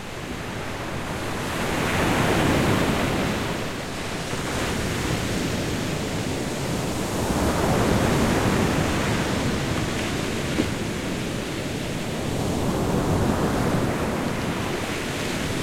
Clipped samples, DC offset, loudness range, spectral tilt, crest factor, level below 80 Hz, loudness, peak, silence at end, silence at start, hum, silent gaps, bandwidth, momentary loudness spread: under 0.1%; under 0.1%; 4 LU; -5 dB/octave; 16 dB; -38 dBFS; -25 LUFS; -8 dBFS; 0 s; 0 s; none; none; 16.5 kHz; 8 LU